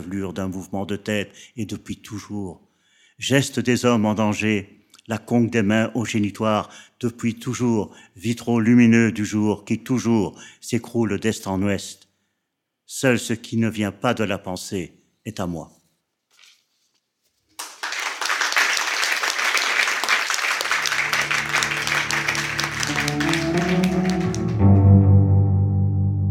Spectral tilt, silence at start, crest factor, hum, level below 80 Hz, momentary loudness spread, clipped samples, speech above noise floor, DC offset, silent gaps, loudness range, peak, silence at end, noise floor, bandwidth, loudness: -5 dB/octave; 0 s; 18 dB; none; -50 dBFS; 14 LU; under 0.1%; 56 dB; under 0.1%; none; 9 LU; -2 dBFS; 0 s; -78 dBFS; 16.5 kHz; -21 LUFS